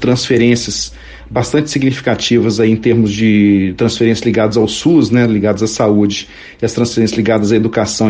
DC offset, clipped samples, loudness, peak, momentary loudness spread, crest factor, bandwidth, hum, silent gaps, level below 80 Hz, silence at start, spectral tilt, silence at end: under 0.1%; under 0.1%; -13 LUFS; 0 dBFS; 8 LU; 12 dB; 9.8 kHz; none; none; -40 dBFS; 0 s; -5.5 dB/octave; 0 s